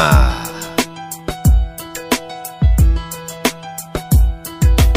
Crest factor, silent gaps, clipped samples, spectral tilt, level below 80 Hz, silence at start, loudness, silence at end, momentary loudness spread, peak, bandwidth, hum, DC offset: 14 dB; none; under 0.1%; -5 dB/octave; -16 dBFS; 0 s; -18 LUFS; 0 s; 13 LU; 0 dBFS; 16 kHz; none; under 0.1%